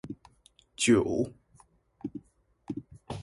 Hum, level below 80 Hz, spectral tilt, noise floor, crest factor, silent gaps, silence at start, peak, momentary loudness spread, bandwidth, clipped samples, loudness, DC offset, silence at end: none; -58 dBFS; -4.5 dB/octave; -64 dBFS; 20 dB; none; 0.05 s; -12 dBFS; 22 LU; 11.5 kHz; under 0.1%; -30 LUFS; under 0.1%; 0 s